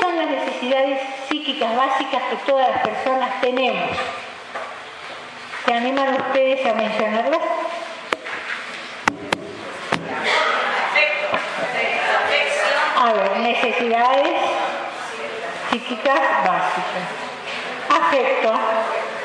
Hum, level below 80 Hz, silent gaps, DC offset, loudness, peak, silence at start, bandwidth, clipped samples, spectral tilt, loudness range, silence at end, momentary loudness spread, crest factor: none; -66 dBFS; none; under 0.1%; -20 LUFS; 0 dBFS; 0 s; 11 kHz; under 0.1%; -3.5 dB/octave; 5 LU; 0 s; 11 LU; 20 dB